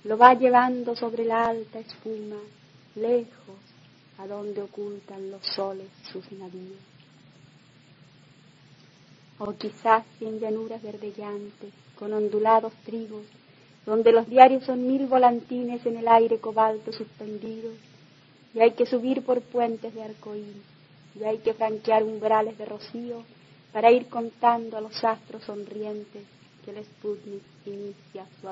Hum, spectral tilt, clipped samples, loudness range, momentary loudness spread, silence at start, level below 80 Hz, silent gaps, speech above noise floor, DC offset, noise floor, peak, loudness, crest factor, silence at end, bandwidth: none; -6.5 dB/octave; under 0.1%; 15 LU; 21 LU; 0.05 s; -76 dBFS; none; 30 dB; under 0.1%; -55 dBFS; 0 dBFS; -24 LUFS; 26 dB; 0 s; 7.6 kHz